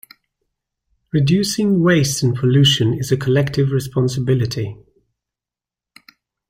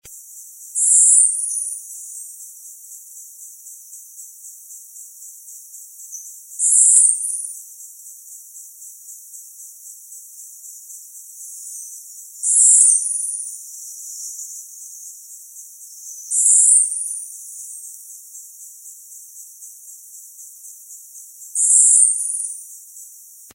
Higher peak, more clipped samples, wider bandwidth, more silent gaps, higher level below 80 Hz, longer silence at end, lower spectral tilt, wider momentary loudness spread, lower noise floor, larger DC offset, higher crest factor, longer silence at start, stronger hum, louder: about the same, -2 dBFS vs 0 dBFS; neither; about the same, 16 kHz vs 16.5 kHz; neither; first, -48 dBFS vs -80 dBFS; first, 1.75 s vs 0.45 s; first, -5.5 dB/octave vs 4.5 dB/octave; second, 7 LU vs 27 LU; first, -89 dBFS vs -43 dBFS; neither; second, 16 dB vs 22 dB; first, 1.15 s vs 0.05 s; neither; second, -17 LUFS vs -13 LUFS